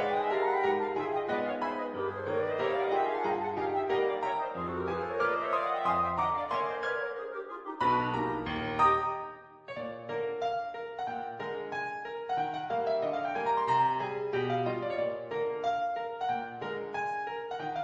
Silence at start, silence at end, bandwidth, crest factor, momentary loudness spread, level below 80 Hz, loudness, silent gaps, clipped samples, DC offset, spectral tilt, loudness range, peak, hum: 0 s; 0 s; 8.4 kHz; 18 dB; 9 LU; -64 dBFS; -32 LUFS; none; under 0.1%; under 0.1%; -6.5 dB/octave; 3 LU; -14 dBFS; none